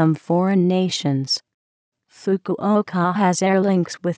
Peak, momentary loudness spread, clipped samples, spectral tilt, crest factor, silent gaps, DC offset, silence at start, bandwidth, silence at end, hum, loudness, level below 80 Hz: -6 dBFS; 6 LU; under 0.1%; -6 dB/octave; 14 dB; 1.54-1.92 s; under 0.1%; 0 s; 8 kHz; 0.05 s; none; -20 LUFS; -68 dBFS